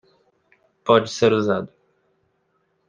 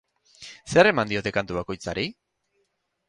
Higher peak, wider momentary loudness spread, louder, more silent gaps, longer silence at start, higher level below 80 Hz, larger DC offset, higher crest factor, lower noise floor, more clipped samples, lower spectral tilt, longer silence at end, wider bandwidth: about the same, -2 dBFS vs -4 dBFS; second, 14 LU vs 23 LU; first, -20 LUFS vs -24 LUFS; neither; first, 0.85 s vs 0.4 s; second, -64 dBFS vs -54 dBFS; neither; about the same, 22 dB vs 22 dB; second, -68 dBFS vs -74 dBFS; neither; about the same, -5.5 dB/octave vs -5 dB/octave; first, 1.2 s vs 0.95 s; second, 9.4 kHz vs 11 kHz